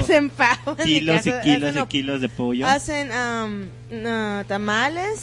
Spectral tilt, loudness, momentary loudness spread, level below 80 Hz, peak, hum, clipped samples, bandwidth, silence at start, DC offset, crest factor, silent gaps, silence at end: -4.5 dB/octave; -21 LUFS; 8 LU; -48 dBFS; -4 dBFS; none; under 0.1%; 11.5 kHz; 0 s; under 0.1%; 18 dB; none; 0 s